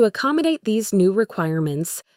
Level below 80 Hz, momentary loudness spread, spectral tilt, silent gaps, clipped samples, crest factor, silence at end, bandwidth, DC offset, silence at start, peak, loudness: -64 dBFS; 5 LU; -5.5 dB/octave; none; under 0.1%; 14 dB; 0.15 s; 16.5 kHz; under 0.1%; 0 s; -6 dBFS; -20 LUFS